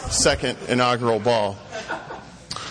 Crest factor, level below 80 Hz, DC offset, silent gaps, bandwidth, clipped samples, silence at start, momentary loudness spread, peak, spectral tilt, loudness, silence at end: 16 dB; -42 dBFS; under 0.1%; none; 10.5 kHz; under 0.1%; 0 s; 15 LU; -6 dBFS; -3 dB/octave; -22 LUFS; 0 s